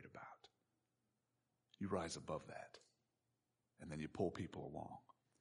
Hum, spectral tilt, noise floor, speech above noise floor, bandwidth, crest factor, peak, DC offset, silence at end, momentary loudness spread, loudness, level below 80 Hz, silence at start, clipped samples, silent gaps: none; -5.5 dB/octave; -89 dBFS; 41 dB; 10.5 kHz; 24 dB; -26 dBFS; under 0.1%; 0.4 s; 16 LU; -48 LUFS; -74 dBFS; 0 s; under 0.1%; none